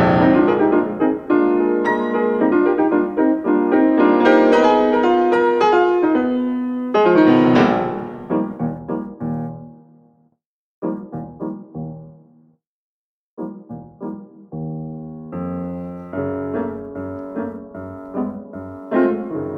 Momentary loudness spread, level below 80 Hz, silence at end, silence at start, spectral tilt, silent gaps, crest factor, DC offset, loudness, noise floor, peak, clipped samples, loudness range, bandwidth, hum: 19 LU; -52 dBFS; 0 s; 0 s; -8 dB/octave; 10.46-10.82 s, 12.67-13.37 s; 16 dB; under 0.1%; -17 LUFS; -66 dBFS; -2 dBFS; under 0.1%; 18 LU; 7.2 kHz; none